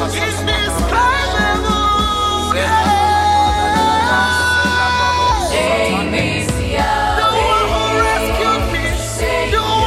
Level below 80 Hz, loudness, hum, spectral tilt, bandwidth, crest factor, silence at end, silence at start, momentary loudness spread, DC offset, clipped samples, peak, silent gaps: -26 dBFS; -15 LUFS; none; -4 dB/octave; 16 kHz; 14 dB; 0 s; 0 s; 4 LU; under 0.1%; under 0.1%; -2 dBFS; none